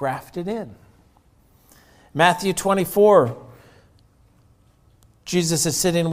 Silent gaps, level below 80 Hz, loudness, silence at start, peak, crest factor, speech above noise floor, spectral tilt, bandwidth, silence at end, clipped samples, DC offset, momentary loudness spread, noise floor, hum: none; -54 dBFS; -19 LUFS; 0 s; -2 dBFS; 22 dB; 37 dB; -4 dB/octave; 16 kHz; 0 s; under 0.1%; under 0.1%; 18 LU; -56 dBFS; none